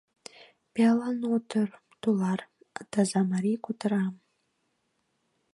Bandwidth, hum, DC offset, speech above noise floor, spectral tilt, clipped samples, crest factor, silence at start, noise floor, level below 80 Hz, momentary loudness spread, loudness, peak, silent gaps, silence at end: 11.5 kHz; none; under 0.1%; 49 dB; -6.5 dB/octave; under 0.1%; 18 dB; 0.4 s; -76 dBFS; -76 dBFS; 20 LU; -28 LUFS; -12 dBFS; none; 1.4 s